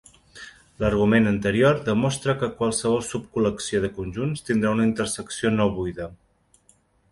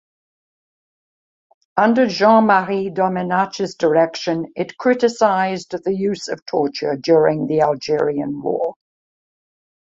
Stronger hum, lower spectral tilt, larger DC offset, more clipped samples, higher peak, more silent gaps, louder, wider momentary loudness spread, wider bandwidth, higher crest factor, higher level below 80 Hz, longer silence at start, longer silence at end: neither; about the same, -5.5 dB/octave vs -5.5 dB/octave; neither; neither; second, -6 dBFS vs -2 dBFS; second, none vs 6.42-6.46 s; second, -23 LUFS vs -18 LUFS; first, 12 LU vs 9 LU; first, 11.5 kHz vs 7.8 kHz; about the same, 18 dB vs 18 dB; first, -46 dBFS vs -62 dBFS; second, 0.35 s vs 1.75 s; second, 0.95 s vs 1.25 s